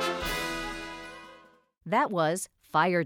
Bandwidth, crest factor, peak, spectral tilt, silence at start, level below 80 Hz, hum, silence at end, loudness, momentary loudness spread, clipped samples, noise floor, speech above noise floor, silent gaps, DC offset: 19.5 kHz; 18 dB; -12 dBFS; -4 dB/octave; 0 s; -50 dBFS; none; 0 s; -29 LUFS; 20 LU; under 0.1%; -55 dBFS; 29 dB; none; under 0.1%